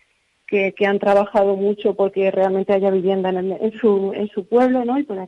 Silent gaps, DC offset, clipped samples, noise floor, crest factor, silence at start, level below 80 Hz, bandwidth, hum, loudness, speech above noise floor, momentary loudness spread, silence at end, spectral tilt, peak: none; under 0.1%; under 0.1%; -47 dBFS; 12 dB; 0.5 s; -62 dBFS; 6 kHz; none; -19 LUFS; 29 dB; 6 LU; 0 s; -8 dB/octave; -6 dBFS